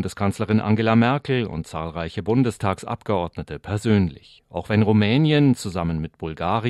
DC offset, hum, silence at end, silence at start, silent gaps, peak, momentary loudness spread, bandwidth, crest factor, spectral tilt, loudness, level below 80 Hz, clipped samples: under 0.1%; none; 0 s; 0 s; none; -4 dBFS; 12 LU; 12.5 kHz; 16 dB; -7 dB/octave; -22 LUFS; -50 dBFS; under 0.1%